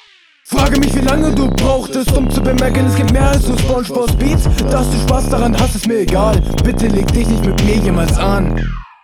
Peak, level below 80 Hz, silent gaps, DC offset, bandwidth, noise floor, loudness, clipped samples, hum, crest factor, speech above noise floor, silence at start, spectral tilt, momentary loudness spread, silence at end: 0 dBFS; -18 dBFS; none; 0.3%; 19 kHz; -43 dBFS; -14 LUFS; under 0.1%; none; 12 dB; 31 dB; 0.45 s; -6 dB/octave; 3 LU; 0.15 s